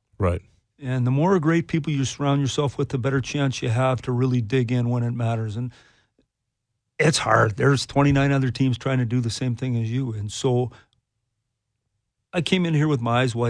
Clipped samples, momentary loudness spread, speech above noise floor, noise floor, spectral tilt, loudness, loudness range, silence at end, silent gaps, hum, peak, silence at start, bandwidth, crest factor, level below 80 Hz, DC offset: under 0.1%; 8 LU; 57 dB; -79 dBFS; -6 dB/octave; -23 LUFS; 5 LU; 0 s; none; none; -4 dBFS; 0.2 s; 10.5 kHz; 20 dB; -50 dBFS; under 0.1%